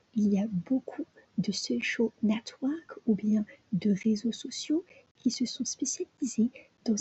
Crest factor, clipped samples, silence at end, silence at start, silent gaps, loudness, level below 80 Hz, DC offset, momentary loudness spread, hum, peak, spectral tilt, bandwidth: 16 dB; under 0.1%; 0 s; 0.15 s; 5.11-5.15 s; -31 LUFS; -74 dBFS; under 0.1%; 7 LU; none; -16 dBFS; -5 dB/octave; 8.4 kHz